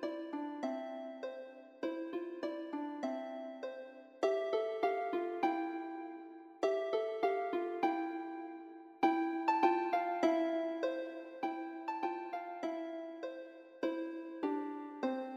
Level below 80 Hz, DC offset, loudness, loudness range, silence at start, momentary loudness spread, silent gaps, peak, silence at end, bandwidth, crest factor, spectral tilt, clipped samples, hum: under -90 dBFS; under 0.1%; -38 LUFS; 7 LU; 0 s; 13 LU; none; -16 dBFS; 0 s; 7.8 kHz; 22 dB; -4.5 dB/octave; under 0.1%; none